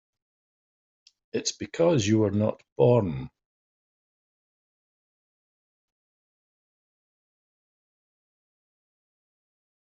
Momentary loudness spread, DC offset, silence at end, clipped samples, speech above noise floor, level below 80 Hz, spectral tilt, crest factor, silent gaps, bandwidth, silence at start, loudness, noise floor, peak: 13 LU; under 0.1%; 6.6 s; under 0.1%; over 66 dB; -62 dBFS; -6.5 dB/octave; 22 dB; 2.72-2.76 s; 7.6 kHz; 1.35 s; -25 LUFS; under -90 dBFS; -8 dBFS